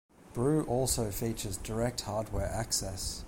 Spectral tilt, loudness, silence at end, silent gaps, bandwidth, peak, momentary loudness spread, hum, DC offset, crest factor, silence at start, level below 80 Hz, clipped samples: -4.5 dB/octave; -33 LUFS; 0 s; none; 17 kHz; -16 dBFS; 7 LU; none; under 0.1%; 16 dB; 0.2 s; -44 dBFS; under 0.1%